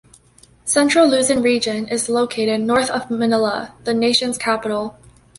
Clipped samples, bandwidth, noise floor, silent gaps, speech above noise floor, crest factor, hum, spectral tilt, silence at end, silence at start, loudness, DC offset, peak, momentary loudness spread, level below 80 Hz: under 0.1%; 11.5 kHz; -51 dBFS; none; 33 dB; 16 dB; none; -3 dB/octave; 0.5 s; 0.65 s; -18 LUFS; under 0.1%; -2 dBFS; 10 LU; -54 dBFS